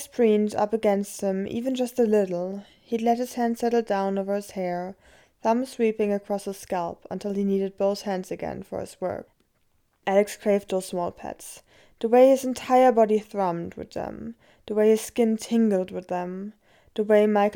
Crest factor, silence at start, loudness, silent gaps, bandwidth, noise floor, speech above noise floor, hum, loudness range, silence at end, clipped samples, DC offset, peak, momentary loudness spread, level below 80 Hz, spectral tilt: 18 dB; 0 s; -25 LUFS; none; 18.5 kHz; -67 dBFS; 43 dB; none; 6 LU; 0 s; under 0.1%; under 0.1%; -6 dBFS; 15 LU; -62 dBFS; -6 dB/octave